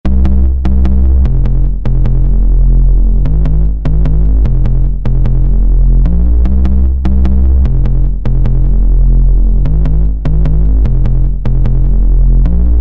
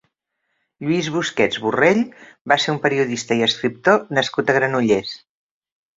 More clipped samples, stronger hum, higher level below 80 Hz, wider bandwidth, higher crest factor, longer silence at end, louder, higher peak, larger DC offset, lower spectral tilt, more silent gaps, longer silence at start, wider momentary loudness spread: neither; neither; first, -8 dBFS vs -60 dBFS; second, 2.6 kHz vs 7.8 kHz; second, 6 dB vs 20 dB; second, 0 s vs 0.8 s; first, -12 LUFS vs -19 LUFS; about the same, -2 dBFS vs 0 dBFS; neither; first, -11 dB/octave vs -4.5 dB/octave; second, none vs 2.41-2.45 s; second, 0.05 s vs 0.8 s; second, 3 LU vs 8 LU